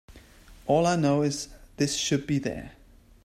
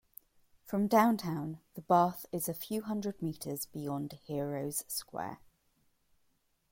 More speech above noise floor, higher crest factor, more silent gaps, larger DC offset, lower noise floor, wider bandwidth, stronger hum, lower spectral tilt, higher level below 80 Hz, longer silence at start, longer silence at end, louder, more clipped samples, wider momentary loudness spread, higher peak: second, 25 dB vs 41 dB; about the same, 18 dB vs 22 dB; neither; neither; second, -51 dBFS vs -74 dBFS; about the same, 15.5 kHz vs 16.5 kHz; neither; about the same, -5 dB/octave vs -5.5 dB/octave; first, -52 dBFS vs -70 dBFS; second, 0.1 s vs 0.65 s; second, 0.55 s vs 1.35 s; first, -26 LUFS vs -34 LUFS; neither; first, 17 LU vs 14 LU; first, -10 dBFS vs -14 dBFS